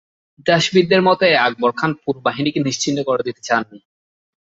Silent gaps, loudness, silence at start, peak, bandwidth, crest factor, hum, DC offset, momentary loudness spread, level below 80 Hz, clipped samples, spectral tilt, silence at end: none; -17 LUFS; 0.45 s; -2 dBFS; 8 kHz; 16 dB; none; under 0.1%; 8 LU; -60 dBFS; under 0.1%; -4.5 dB/octave; 0.65 s